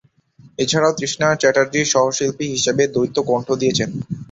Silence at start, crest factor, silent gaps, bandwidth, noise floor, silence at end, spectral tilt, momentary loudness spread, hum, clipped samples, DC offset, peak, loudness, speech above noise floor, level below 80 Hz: 0.45 s; 16 dB; none; 8 kHz; -49 dBFS; 0.05 s; -3.5 dB/octave; 6 LU; none; under 0.1%; under 0.1%; -2 dBFS; -18 LUFS; 31 dB; -54 dBFS